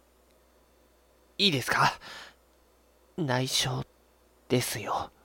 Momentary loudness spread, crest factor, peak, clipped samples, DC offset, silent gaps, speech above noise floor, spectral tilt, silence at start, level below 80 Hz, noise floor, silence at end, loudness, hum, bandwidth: 19 LU; 24 dB; -8 dBFS; under 0.1%; under 0.1%; none; 34 dB; -3.5 dB/octave; 1.4 s; -60 dBFS; -63 dBFS; 0.15 s; -28 LUFS; none; 17 kHz